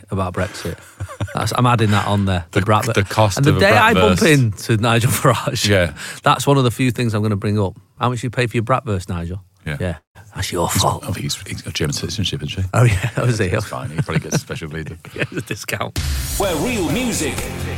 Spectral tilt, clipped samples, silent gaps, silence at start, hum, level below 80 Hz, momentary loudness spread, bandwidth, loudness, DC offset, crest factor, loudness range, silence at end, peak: -5 dB/octave; under 0.1%; 10.07-10.15 s; 0.1 s; none; -38 dBFS; 12 LU; 17 kHz; -18 LUFS; under 0.1%; 16 dB; 8 LU; 0 s; -2 dBFS